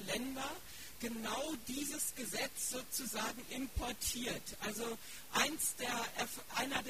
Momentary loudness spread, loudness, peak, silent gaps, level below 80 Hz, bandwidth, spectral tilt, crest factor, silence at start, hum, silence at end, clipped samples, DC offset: 8 LU; -39 LUFS; -18 dBFS; none; -58 dBFS; 15.5 kHz; -2 dB/octave; 24 dB; 0 s; none; 0 s; under 0.1%; 0.2%